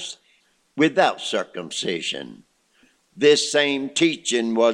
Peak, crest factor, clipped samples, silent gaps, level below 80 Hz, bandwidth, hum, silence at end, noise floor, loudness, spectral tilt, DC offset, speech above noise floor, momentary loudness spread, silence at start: -4 dBFS; 20 dB; under 0.1%; none; -72 dBFS; 11 kHz; none; 0 s; -62 dBFS; -21 LUFS; -3 dB/octave; under 0.1%; 42 dB; 16 LU; 0 s